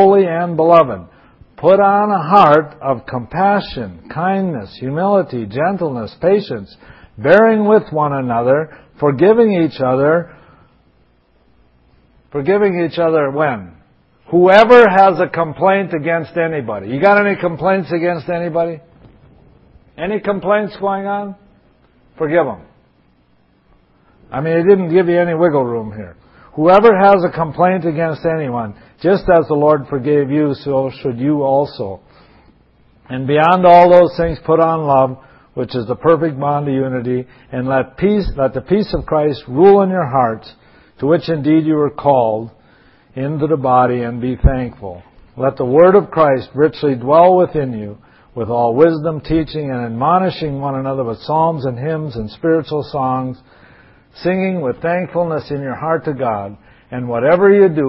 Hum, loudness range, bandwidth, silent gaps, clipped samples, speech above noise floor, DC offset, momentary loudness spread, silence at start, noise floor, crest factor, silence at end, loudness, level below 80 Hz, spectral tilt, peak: none; 8 LU; 6.2 kHz; none; under 0.1%; 41 dB; under 0.1%; 14 LU; 0 s; -55 dBFS; 14 dB; 0 s; -14 LUFS; -36 dBFS; -9 dB/octave; 0 dBFS